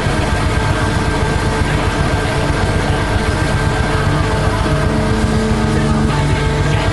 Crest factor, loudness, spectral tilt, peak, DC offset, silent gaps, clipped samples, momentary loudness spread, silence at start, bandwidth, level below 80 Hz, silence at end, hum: 12 dB; -16 LUFS; -6 dB/octave; -2 dBFS; under 0.1%; none; under 0.1%; 1 LU; 0 s; 12 kHz; -22 dBFS; 0 s; none